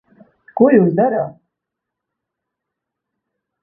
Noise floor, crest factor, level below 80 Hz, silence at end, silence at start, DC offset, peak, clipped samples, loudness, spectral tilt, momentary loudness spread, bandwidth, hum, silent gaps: -81 dBFS; 20 dB; -62 dBFS; 2.3 s; 0.55 s; under 0.1%; 0 dBFS; under 0.1%; -14 LUFS; -14.5 dB/octave; 16 LU; 2.9 kHz; none; none